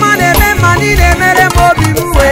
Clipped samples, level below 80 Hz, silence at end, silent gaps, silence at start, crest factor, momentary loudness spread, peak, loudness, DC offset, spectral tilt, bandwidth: 1%; -16 dBFS; 0 s; none; 0 s; 8 dB; 3 LU; 0 dBFS; -8 LUFS; under 0.1%; -4.5 dB/octave; 16.5 kHz